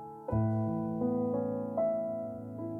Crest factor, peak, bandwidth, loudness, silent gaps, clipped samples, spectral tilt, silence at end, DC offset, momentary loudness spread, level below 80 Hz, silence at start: 12 dB; -20 dBFS; 2.6 kHz; -33 LUFS; none; under 0.1%; -12.5 dB/octave; 0 s; under 0.1%; 7 LU; -56 dBFS; 0 s